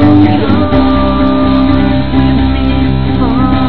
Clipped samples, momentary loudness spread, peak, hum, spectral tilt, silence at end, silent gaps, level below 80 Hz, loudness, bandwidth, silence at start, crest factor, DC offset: 1%; 3 LU; 0 dBFS; none; -10.5 dB/octave; 0 s; none; -18 dBFS; -10 LUFS; 5.4 kHz; 0 s; 10 dB; 10%